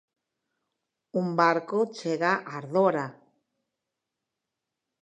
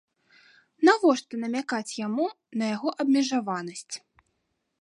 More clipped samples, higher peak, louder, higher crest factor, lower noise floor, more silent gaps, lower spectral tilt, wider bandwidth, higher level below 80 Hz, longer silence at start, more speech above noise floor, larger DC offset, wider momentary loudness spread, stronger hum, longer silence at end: neither; about the same, -6 dBFS vs -8 dBFS; about the same, -26 LUFS vs -26 LUFS; about the same, 22 dB vs 20 dB; first, -86 dBFS vs -77 dBFS; neither; first, -6.5 dB/octave vs -4 dB/octave; second, 9.2 kHz vs 11.5 kHz; second, -86 dBFS vs -80 dBFS; first, 1.15 s vs 0.8 s; first, 60 dB vs 51 dB; neither; second, 9 LU vs 14 LU; neither; first, 1.9 s vs 0.85 s